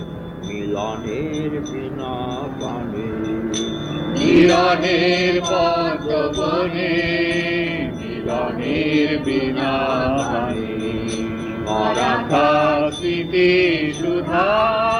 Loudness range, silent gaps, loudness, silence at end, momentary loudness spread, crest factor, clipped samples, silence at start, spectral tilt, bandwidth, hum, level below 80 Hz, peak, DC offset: 8 LU; none; -19 LUFS; 0 s; 11 LU; 16 dB; under 0.1%; 0 s; -5.5 dB/octave; 10.5 kHz; none; -42 dBFS; -4 dBFS; under 0.1%